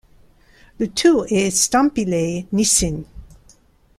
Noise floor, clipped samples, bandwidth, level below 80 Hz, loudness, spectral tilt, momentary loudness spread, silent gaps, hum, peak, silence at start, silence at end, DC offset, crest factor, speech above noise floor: -53 dBFS; under 0.1%; 15 kHz; -42 dBFS; -18 LUFS; -3.5 dB/octave; 9 LU; none; none; -2 dBFS; 0.8 s; 0.7 s; under 0.1%; 18 dB; 36 dB